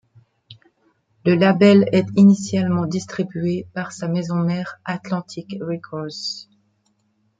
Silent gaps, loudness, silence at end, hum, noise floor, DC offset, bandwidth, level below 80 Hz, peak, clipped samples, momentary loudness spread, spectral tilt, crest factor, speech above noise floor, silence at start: none; -19 LUFS; 1 s; none; -66 dBFS; under 0.1%; 7.8 kHz; -64 dBFS; -2 dBFS; under 0.1%; 15 LU; -7 dB/octave; 18 dB; 47 dB; 0.5 s